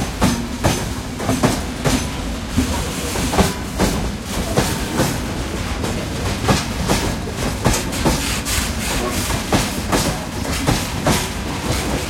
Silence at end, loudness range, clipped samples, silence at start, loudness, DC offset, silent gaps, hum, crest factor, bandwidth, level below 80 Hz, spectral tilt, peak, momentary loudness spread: 0 s; 1 LU; under 0.1%; 0 s; -20 LUFS; under 0.1%; none; none; 18 dB; 16.5 kHz; -28 dBFS; -4 dB/octave; -2 dBFS; 5 LU